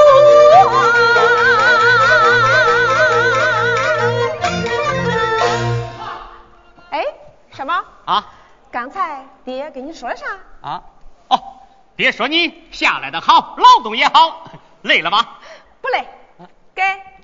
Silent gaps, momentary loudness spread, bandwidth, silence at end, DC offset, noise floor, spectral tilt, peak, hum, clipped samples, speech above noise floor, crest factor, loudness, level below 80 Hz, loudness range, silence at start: none; 19 LU; 7.6 kHz; 0.15 s; 0.3%; -45 dBFS; -4 dB/octave; 0 dBFS; none; under 0.1%; 30 dB; 14 dB; -13 LUFS; -48 dBFS; 13 LU; 0 s